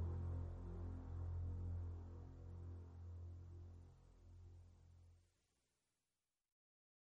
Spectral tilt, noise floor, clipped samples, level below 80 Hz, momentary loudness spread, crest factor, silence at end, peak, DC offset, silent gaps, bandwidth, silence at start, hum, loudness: -9.5 dB/octave; under -90 dBFS; under 0.1%; -58 dBFS; 18 LU; 14 dB; 1.95 s; -38 dBFS; under 0.1%; none; 2.4 kHz; 0 s; 60 Hz at -90 dBFS; -52 LUFS